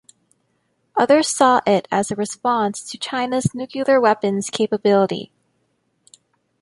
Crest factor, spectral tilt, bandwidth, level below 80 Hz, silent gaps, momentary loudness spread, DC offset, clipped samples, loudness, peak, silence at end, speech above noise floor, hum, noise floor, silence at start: 18 dB; -4.5 dB/octave; 11.5 kHz; -60 dBFS; none; 9 LU; under 0.1%; under 0.1%; -19 LUFS; -2 dBFS; 1.35 s; 49 dB; none; -68 dBFS; 0.95 s